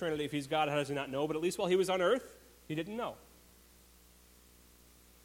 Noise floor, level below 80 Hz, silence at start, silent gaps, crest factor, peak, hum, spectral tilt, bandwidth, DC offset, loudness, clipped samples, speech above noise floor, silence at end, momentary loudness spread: -61 dBFS; -66 dBFS; 0 s; none; 18 dB; -18 dBFS; 60 Hz at -60 dBFS; -5 dB/octave; 16.5 kHz; under 0.1%; -34 LUFS; under 0.1%; 28 dB; 2.05 s; 11 LU